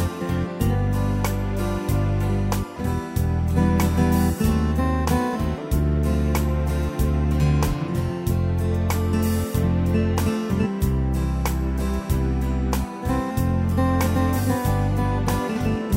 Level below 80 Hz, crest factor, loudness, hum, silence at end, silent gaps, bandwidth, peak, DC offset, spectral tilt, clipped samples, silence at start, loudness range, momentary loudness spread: -28 dBFS; 14 dB; -23 LUFS; none; 0 s; none; 16.5 kHz; -6 dBFS; under 0.1%; -7 dB/octave; under 0.1%; 0 s; 2 LU; 5 LU